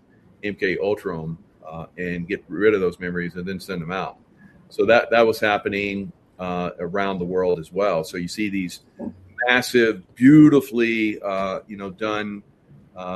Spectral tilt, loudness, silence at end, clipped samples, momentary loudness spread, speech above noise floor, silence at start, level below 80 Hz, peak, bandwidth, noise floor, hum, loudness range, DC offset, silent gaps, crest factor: -6 dB/octave; -21 LUFS; 0 s; under 0.1%; 18 LU; 21 dB; 0.45 s; -56 dBFS; 0 dBFS; 13 kHz; -42 dBFS; none; 7 LU; under 0.1%; none; 20 dB